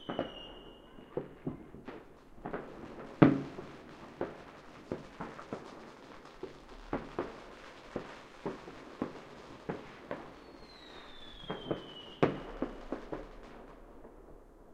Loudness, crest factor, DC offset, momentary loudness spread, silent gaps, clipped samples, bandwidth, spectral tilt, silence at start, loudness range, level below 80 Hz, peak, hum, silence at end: -38 LUFS; 36 dB; under 0.1%; 18 LU; none; under 0.1%; 10.5 kHz; -7.5 dB/octave; 0 s; 11 LU; -58 dBFS; -4 dBFS; none; 0 s